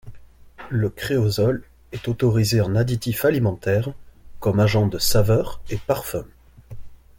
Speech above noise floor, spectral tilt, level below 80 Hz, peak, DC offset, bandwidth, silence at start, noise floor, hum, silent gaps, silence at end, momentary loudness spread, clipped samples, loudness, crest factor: 22 dB; -6 dB/octave; -40 dBFS; -4 dBFS; under 0.1%; 17 kHz; 0.05 s; -42 dBFS; none; none; 0.25 s; 12 LU; under 0.1%; -22 LUFS; 16 dB